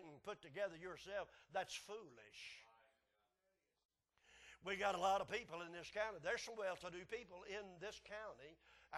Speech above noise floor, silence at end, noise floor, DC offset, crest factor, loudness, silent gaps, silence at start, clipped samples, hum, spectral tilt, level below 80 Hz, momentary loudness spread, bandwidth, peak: 40 dB; 0 s; -87 dBFS; under 0.1%; 22 dB; -47 LUFS; 3.85-3.89 s; 0 s; under 0.1%; none; -3 dB/octave; -78 dBFS; 16 LU; 12.5 kHz; -28 dBFS